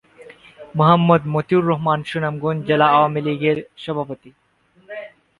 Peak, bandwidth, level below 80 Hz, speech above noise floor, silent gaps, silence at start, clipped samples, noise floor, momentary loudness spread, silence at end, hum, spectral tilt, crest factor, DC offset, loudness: 0 dBFS; 11 kHz; -58 dBFS; 28 dB; none; 0.2 s; under 0.1%; -45 dBFS; 20 LU; 0.3 s; none; -8.5 dB/octave; 20 dB; under 0.1%; -18 LUFS